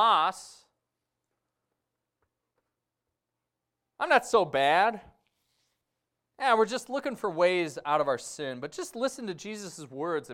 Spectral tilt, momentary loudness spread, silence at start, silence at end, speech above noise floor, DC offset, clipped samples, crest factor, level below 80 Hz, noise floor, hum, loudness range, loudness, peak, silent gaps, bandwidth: -3.5 dB/octave; 15 LU; 0 s; 0 s; 58 dB; under 0.1%; under 0.1%; 20 dB; -72 dBFS; -86 dBFS; none; 4 LU; -28 LUFS; -10 dBFS; none; 16 kHz